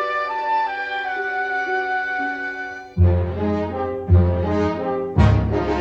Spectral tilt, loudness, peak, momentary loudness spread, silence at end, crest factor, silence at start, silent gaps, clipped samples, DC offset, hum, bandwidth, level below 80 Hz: -8 dB/octave; -21 LUFS; -2 dBFS; 8 LU; 0 s; 18 dB; 0 s; none; under 0.1%; under 0.1%; none; 6.6 kHz; -30 dBFS